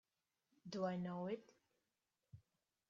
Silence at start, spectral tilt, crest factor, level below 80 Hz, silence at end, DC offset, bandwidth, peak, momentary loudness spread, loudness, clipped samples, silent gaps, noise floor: 0.65 s; -6.5 dB/octave; 20 dB; -86 dBFS; 0.5 s; under 0.1%; 7.2 kHz; -30 dBFS; 24 LU; -46 LUFS; under 0.1%; none; under -90 dBFS